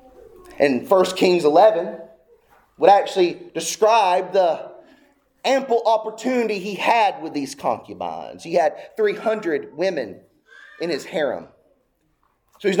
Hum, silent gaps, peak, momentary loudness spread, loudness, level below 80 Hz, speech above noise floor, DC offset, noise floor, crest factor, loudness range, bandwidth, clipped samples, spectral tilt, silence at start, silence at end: none; none; -2 dBFS; 14 LU; -20 LUFS; -66 dBFS; 46 dB; under 0.1%; -66 dBFS; 20 dB; 7 LU; 19 kHz; under 0.1%; -4 dB/octave; 0.5 s; 0 s